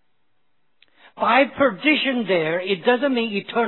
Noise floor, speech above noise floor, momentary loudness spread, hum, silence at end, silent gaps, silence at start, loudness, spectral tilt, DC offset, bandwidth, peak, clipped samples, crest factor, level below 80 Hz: -73 dBFS; 54 dB; 6 LU; none; 0 s; none; 1.2 s; -20 LUFS; -8 dB/octave; 0.1%; 4.3 kHz; -2 dBFS; under 0.1%; 18 dB; -64 dBFS